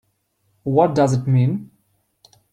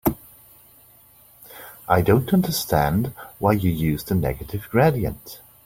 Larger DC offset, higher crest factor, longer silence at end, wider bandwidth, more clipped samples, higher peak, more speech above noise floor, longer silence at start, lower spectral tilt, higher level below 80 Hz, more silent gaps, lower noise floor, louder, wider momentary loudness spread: neither; about the same, 18 dB vs 20 dB; first, 0.9 s vs 0.3 s; second, 9.6 kHz vs 17 kHz; neither; about the same, -2 dBFS vs -2 dBFS; first, 50 dB vs 31 dB; first, 0.65 s vs 0.05 s; first, -8 dB/octave vs -6.5 dB/octave; second, -58 dBFS vs -42 dBFS; neither; first, -67 dBFS vs -52 dBFS; first, -18 LUFS vs -22 LUFS; second, 12 LU vs 21 LU